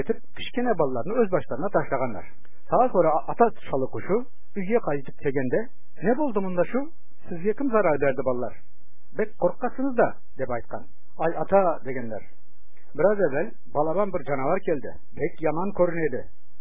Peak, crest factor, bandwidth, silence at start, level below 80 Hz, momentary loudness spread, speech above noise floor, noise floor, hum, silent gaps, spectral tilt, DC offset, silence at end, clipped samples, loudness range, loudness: -6 dBFS; 20 dB; 3.8 kHz; 0 s; -56 dBFS; 13 LU; 35 dB; -61 dBFS; none; none; -10.5 dB/octave; 6%; 0.3 s; under 0.1%; 3 LU; -26 LUFS